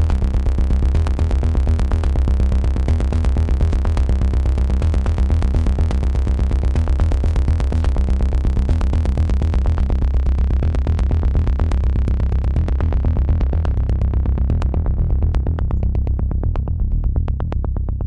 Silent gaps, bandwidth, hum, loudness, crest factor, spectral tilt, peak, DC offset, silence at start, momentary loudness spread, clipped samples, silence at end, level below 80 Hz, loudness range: none; 7.2 kHz; none; -19 LUFS; 10 dB; -8.5 dB/octave; -6 dBFS; under 0.1%; 0 s; 3 LU; under 0.1%; 0 s; -18 dBFS; 1 LU